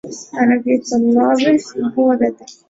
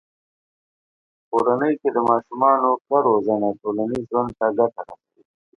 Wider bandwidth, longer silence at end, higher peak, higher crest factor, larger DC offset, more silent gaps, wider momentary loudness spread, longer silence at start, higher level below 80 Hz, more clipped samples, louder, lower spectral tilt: second, 7.8 kHz vs 8.6 kHz; second, 0.15 s vs 0.65 s; about the same, -2 dBFS vs -2 dBFS; second, 14 dB vs 20 dB; neither; second, none vs 2.81-2.85 s; about the same, 7 LU vs 7 LU; second, 0.05 s vs 1.3 s; about the same, -58 dBFS vs -62 dBFS; neither; first, -15 LUFS vs -20 LUFS; second, -5 dB/octave vs -9 dB/octave